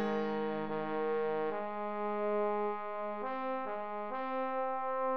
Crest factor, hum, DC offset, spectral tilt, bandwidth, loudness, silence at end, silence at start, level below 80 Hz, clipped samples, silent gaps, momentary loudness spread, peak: 12 dB; none; 0.4%; -8 dB/octave; 6.4 kHz; -36 LUFS; 0 s; 0 s; -74 dBFS; under 0.1%; none; 5 LU; -24 dBFS